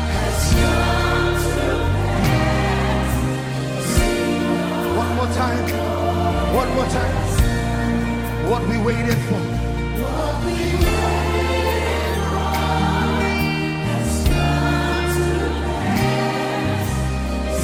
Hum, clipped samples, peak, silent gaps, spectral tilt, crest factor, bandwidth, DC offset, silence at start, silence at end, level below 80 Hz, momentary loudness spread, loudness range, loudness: none; under 0.1%; -4 dBFS; none; -5.5 dB/octave; 16 dB; 17 kHz; under 0.1%; 0 s; 0 s; -26 dBFS; 4 LU; 1 LU; -20 LUFS